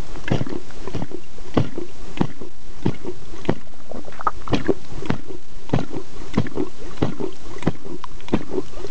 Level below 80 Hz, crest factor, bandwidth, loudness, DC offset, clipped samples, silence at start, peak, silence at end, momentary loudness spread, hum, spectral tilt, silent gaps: -40 dBFS; 24 dB; 8 kHz; -27 LUFS; 20%; under 0.1%; 0 s; -4 dBFS; 0 s; 12 LU; none; -7 dB/octave; none